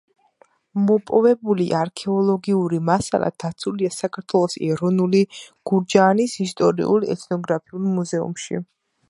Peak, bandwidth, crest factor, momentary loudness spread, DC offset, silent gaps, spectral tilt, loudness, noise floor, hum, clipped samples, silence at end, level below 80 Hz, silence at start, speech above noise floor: -2 dBFS; 11.5 kHz; 20 dB; 9 LU; under 0.1%; none; -6 dB/octave; -21 LUFS; -58 dBFS; none; under 0.1%; 0.45 s; -60 dBFS; 0.75 s; 38 dB